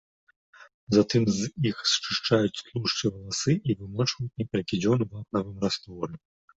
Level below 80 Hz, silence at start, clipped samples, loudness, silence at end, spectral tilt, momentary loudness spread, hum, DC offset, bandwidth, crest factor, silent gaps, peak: -58 dBFS; 0.6 s; under 0.1%; -27 LUFS; 0.4 s; -5 dB/octave; 8 LU; none; under 0.1%; 8.2 kHz; 20 dB; 0.74-0.87 s; -8 dBFS